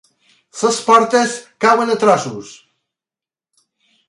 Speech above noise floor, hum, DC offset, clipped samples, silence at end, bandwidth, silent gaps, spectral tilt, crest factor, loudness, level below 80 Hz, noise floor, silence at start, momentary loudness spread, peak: over 75 dB; none; under 0.1%; under 0.1%; 1.55 s; 11.5 kHz; none; -3.5 dB/octave; 18 dB; -14 LUFS; -66 dBFS; under -90 dBFS; 0.55 s; 15 LU; 0 dBFS